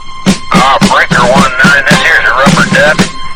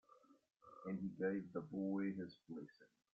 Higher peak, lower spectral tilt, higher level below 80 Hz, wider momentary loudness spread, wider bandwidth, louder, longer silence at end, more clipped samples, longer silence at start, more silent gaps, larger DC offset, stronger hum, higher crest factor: first, 0 dBFS vs -30 dBFS; second, -4 dB/octave vs -8 dB/octave; first, -26 dBFS vs -84 dBFS; second, 4 LU vs 12 LU; first, 19.5 kHz vs 5 kHz; first, -6 LUFS vs -46 LUFS; second, 0 s vs 0.25 s; first, 8% vs under 0.1%; second, 0 s vs 0.15 s; neither; neither; neither; second, 6 dB vs 16 dB